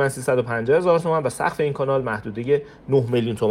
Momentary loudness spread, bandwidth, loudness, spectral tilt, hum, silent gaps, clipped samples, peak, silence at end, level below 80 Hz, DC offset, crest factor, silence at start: 5 LU; 16 kHz; -22 LUFS; -6.5 dB/octave; none; none; under 0.1%; -6 dBFS; 0 s; -54 dBFS; under 0.1%; 14 dB; 0 s